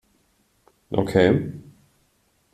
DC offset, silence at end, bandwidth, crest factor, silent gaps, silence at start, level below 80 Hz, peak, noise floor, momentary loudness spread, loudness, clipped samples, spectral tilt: under 0.1%; 0.95 s; 13.5 kHz; 22 dB; none; 0.9 s; -54 dBFS; -4 dBFS; -65 dBFS; 17 LU; -22 LUFS; under 0.1%; -7.5 dB/octave